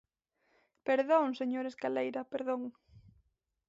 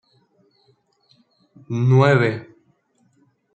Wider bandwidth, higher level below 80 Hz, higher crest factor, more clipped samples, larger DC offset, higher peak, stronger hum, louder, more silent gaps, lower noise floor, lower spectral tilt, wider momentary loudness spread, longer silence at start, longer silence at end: about the same, 7.6 kHz vs 8 kHz; second, -76 dBFS vs -64 dBFS; about the same, 20 dB vs 20 dB; neither; neither; second, -16 dBFS vs -2 dBFS; neither; second, -33 LUFS vs -18 LUFS; neither; first, -78 dBFS vs -63 dBFS; second, -3 dB/octave vs -8 dB/octave; second, 11 LU vs 15 LU; second, 0.85 s vs 1.7 s; second, 0.7 s vs 1.1 s